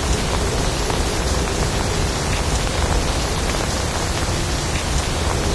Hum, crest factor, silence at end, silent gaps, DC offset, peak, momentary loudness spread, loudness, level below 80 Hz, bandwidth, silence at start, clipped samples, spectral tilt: none; 16 dB; 0 s; none; 0.3%; -4 dBFS; 1 LU; -21 LUFS; -24 dBFS; 11 kHz; 0 s; under 0.1%; -4 dB/octave